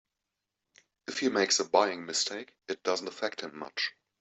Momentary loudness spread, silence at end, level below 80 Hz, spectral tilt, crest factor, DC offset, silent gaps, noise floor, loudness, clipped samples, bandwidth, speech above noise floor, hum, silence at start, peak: 14 LU; 0.3 s; -80 dBFS; -1.5 dB/octave; 24 dB; under 0.1%; none; -87 dBFS; -30 LUFS; under 0.1%; 8.4 kHz; 56 dB; none; 1.1 s; -8 dBFS